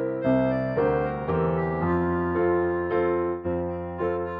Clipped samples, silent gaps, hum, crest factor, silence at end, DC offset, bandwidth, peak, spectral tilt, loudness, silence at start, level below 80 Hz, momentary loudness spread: under 0.1%; none; none; 12 dB; 0 s; under 0.1%; 5 kHz; -12 dBFS; -11 dB/octave; -25 LUFS; 0 s; -46 dBFS; 5 LU